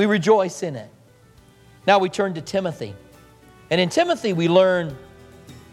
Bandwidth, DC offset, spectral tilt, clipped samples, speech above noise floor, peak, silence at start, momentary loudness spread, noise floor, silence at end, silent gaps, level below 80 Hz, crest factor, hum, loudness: 13.5 kHz; under 0.1%; -5.5 dB/octave; under 0.1%; 32 dB; -2 dBFS; 0 s; 16 LU; -51 dBFS; 0.15 s; none; -58 dBFS; 20 dB; none; -20 LUFS